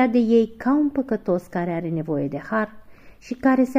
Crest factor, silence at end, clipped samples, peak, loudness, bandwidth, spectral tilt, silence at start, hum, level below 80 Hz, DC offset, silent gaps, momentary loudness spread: 14 dB; 0 s; under 0.1%; -6 dBFS; -23 LUFS; 14.5 kHz; -8 dB/octave; 0 s; none; -54 dBFS; under 0.1%; none; 8 LU